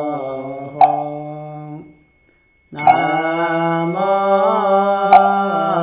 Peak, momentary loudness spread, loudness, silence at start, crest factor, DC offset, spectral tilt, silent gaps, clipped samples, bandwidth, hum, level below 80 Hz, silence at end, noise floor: 0 dBFS; 20 LU; -15 LUFS; 0 s; 16 dB; under 0.1%; -9.5 dB/octave; none; 0.2%; 4 kHz; none; -60 dBFS; 0 s; -56 dBFS